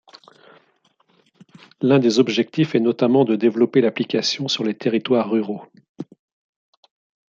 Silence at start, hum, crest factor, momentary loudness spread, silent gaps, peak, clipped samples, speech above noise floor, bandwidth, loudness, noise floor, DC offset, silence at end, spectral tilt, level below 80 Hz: 1.8 s; none; 18 dB; 15 LU; 5.89-5.95 s; -4 dBFS; under 0.1%; 44 dB; 7.6 kHz; -19 LUFS; -62 dBFS; under 0.1%; 1.25 s; -5.5 dB/octave; -70 dBFS